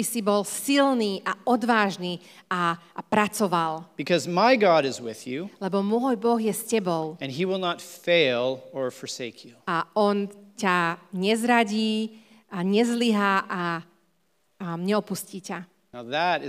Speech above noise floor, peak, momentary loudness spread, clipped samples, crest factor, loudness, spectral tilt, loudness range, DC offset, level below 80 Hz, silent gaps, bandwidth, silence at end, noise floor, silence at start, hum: 46 dB; -6 dBFS; 13 LU; under 0.1%; 20 dB; -25 LUFS; -4.5 dB/octave; 3 LU; under 0.1%; -78 dBFS; none; 16 kHz; 0 s; -71 dBFS; 0 s; none